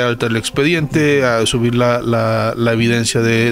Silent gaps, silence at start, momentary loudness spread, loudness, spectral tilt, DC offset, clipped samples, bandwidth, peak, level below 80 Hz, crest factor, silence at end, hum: none; 0 s; 3 LU; -15 LUFS; -5 dB/octave; under 0.1%; under 0.1%; 16 kHz; -2 dBFS; -40 dBFS; 12 dB; 0 s; none